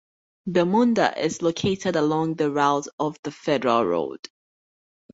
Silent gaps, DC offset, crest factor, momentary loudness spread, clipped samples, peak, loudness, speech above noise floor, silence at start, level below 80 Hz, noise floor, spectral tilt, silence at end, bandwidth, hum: 2.93-2.98 s, 3.19-3.23 s; under 0.1%; 20 dB; 11 LU; under 0.1%; -4 dBFS; -23 LUFS; over 68 dB; 0.45 s; -60 dBFS; under -90 dBFS; -5.5 dB/octave; 1 s; 8 kHz; none